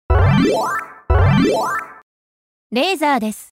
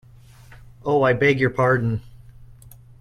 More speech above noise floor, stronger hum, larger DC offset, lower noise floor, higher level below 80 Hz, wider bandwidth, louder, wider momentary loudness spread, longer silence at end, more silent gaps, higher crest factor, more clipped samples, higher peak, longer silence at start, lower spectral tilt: first, over 71 dB vs 28 dB; neither; neither; first, under -90 dBFS vs -47 dBFS; first, -26 dBFS vs -48 dBFS; first, 16 kHz vs 13.5 kHz; first, -17 LUFS vs -20 LUFS; about the same, 11 LU vs 12 LU; second, 0.1 s vs 0.55 s; first, 2.02-2.70 s vs none; second, 12 dB vs 18 dB; neither; about the same, -6 dBFS vs -6 dBFS; second, 0.1 s vs 0.85 s; about the same, -6.5 dB/octave vs -7.5 dB/octave